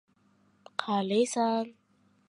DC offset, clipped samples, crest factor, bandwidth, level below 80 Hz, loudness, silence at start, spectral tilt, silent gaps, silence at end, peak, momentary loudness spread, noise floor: under 0.1%; under 0.1%; 22 dB; 11.5 kHz; -82 dBFS; -30 LUFS; 0.8 s; -4.5 dB/octave; none; 0.55 s; -8 dBFS; 11 LU; -67 dBFS